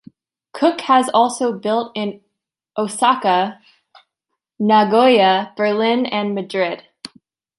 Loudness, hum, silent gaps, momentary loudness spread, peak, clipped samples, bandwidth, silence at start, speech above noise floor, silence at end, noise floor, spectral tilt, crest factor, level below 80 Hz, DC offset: -17 LUFS; none; none; 16 LU; -2 dBFS; under 0.1%; 11.5 kHz; 0.55 s; 62 dB; 0.5 s; -79 dBFS; -4.5 dB/octave; 16 dB; -70 dBFS; under 0.1%